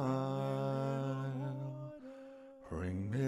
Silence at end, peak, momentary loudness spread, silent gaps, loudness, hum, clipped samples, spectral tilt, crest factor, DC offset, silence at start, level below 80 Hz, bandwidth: 0 s; -24 dBFS; 16 LU; none; -39 LUFS; none; under 0.1%; -8.5 dB/octave; 14 dB; under 0.1%; 0 s; -64 dBFS; 11 kHz